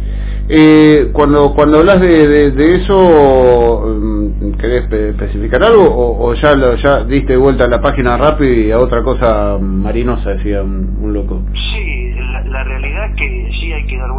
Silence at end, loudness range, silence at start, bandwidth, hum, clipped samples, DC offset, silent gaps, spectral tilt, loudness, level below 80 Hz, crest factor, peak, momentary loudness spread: 0 s; 10 LU; 0 s; 4 kHz; 50 Hz at -20 dBFS; 1%; under 0.1%; none; -11 dB/octave; -11 LUFS; -18 dBFS; 10 dB; 0 dBFS; 12 LU